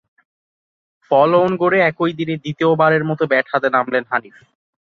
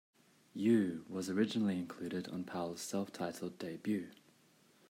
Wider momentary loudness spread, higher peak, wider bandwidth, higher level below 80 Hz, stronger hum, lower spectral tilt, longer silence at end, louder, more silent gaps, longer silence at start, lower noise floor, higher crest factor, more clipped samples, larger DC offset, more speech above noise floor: about the same, 9 LU vs 11 LU; first, -2 dBFS vs -20 dBFS; second, 6.6 kHz vs 16 kHz; first, -62 dBFS vs -82 dBFS; neither; first, -8 dB/octave vs -5.5 dB/octave; about the same, 0.65 s vs 0.75 s; first, -17 LUFS vs -38 LUFS; neither; first, 1.1 s vs 0.55 s; first, under -90 dBFS vs -68 dBFS; about the same, 16 dB vs 18 dB; neither; neither; first, over 74 dB vs 31 dB